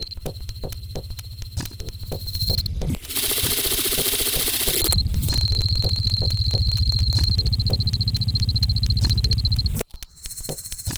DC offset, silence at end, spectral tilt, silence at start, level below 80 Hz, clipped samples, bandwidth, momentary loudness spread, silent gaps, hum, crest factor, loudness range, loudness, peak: 0.2%; 0 s; -3.5 dB/octave; 0 s; -28 dBFS; under 0.1%; over 20 kHz; 14 LU; none; none; 20 dB; 4 LU; -21 LUFS; -2 dBFS